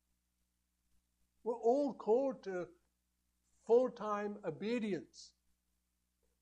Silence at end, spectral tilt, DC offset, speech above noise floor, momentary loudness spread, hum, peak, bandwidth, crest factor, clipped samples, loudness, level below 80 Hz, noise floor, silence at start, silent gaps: 1.15 s; -6.5 dB/octave; under 0.1%; 47 dB; 17 LU; 60 Hz at -70 dBFS; -20 dBFS; 9 kHz; 20 dB; under 0.1%; -37 LUFS; -82 dBFS; -83 dBFS; 1.45 s; none